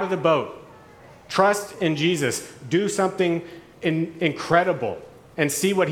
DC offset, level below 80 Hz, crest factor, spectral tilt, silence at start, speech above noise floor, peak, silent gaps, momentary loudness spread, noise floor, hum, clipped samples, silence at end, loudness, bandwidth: under 0.1%; -62 dBFS; 20 dB; -4.5 dB/octave; 0 s; 25 dB; -2 dBFS; none; 11 LU; -47 dBFS; none; under 0.1%; 0 s; -23 LUFS; 19.5 kHz